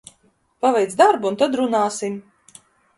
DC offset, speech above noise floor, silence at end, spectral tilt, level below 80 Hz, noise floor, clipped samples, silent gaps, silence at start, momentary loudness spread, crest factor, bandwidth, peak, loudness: under 0.1%; 43 dB; 0.8 s; -4 dB/octave; -68 dBFS; -61 dBFS; under 0.1%; none; 0.65 s; 12 LU; 20 dB; 11.5 kHz; 0 dBFS; -19 LUFS